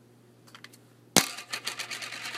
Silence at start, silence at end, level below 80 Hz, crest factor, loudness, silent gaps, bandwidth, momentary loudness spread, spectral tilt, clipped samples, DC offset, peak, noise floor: 0.45 s; 0 s; -70 dBFS; 34 dB; -29 LUFS; none; 16 kHz; 25 LU; -1.5 dB/octave; under 0.1%; under 0.1%; 0 dBFS; -57 dBFS